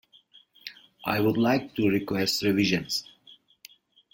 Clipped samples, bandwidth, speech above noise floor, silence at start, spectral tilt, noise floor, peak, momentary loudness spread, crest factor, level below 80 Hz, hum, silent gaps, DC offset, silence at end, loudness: under 0.1%; 17 kHz; 33 dB; 0.65 s; -5 dB/octave; -58 dBFS; -8 dBFS; 19 LU; 20 dB; -60 dBFS; none; none; under 0.1%; 1.1 s; -26 LUFS